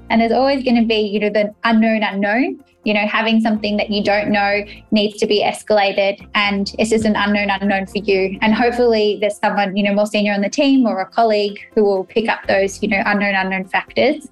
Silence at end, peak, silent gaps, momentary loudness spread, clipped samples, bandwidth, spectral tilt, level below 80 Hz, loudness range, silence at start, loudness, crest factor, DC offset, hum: 0.05 s; -4 dBFS; none; 4 LU; under 0.1%; 12 kHz; -5 dB/octave; -48 dBFS; 1 LU; 0.05 s; -16 LUFS; 12 dB; 0.1%; none